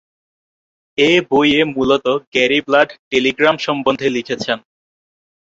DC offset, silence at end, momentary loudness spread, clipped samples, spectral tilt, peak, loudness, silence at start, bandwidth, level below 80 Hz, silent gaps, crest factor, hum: under 0.1%; 0.9 s; 8 LU; under 0.1%; -4.5 dB/octave; 0 dBFS; -15 LUFS; 1 s; 7.8 kHz; -54 dBFS; 2.27-2.32 s, 2.99-3.11 s; 16 dB; none